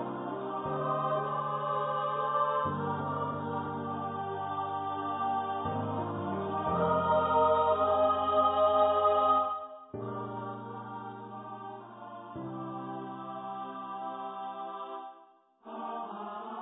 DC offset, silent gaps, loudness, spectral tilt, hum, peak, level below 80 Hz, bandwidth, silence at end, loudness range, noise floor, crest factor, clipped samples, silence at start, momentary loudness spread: under 0.1%; none; -31 LUFS; -10 dB/octave; none; -14 dBFS; -60 dBFS; 4 kHz; 0 s; 14 LU; -60 dBFS; 18 dB; under 0.1%; 0 s; 17 LU